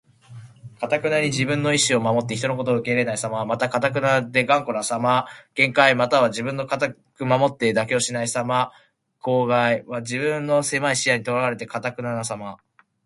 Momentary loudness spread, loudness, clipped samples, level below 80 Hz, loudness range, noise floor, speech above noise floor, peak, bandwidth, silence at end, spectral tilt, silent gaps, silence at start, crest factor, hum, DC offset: 9 LU; -21 LUFS; under 0.1%; -62 dBFS; 3 LU; -43 dBFS; 22 dB; 0 dBFS; 11.5 kHz; 0.5 s; -4 dB/octave; none; 0.3 s; 22 dB; none; under 0.1%